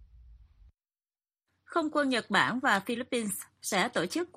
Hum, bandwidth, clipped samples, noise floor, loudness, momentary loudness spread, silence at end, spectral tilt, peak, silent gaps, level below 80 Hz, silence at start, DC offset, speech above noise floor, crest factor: none; 15 kHz; under 0.1%; under -90 dBFS; -29 LUFS; 7 LU; 0.1 s; -3 dB/octave; -10 dBFS; none; -64 dBFS; 0.25 s; under 0.1%; over 60 dB; 22 dB